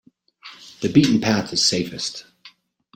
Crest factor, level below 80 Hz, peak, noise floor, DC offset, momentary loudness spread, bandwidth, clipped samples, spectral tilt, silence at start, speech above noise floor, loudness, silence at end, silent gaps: 20 dB; -56 dBFS; -2 dBFS; -51 dBFS; under 0.1%; 21 LU; 16.5 kHz; under 0.1%; -4 dB/octave; 0.45 s; 31 dB; -19 LUFS; 0.45 s; none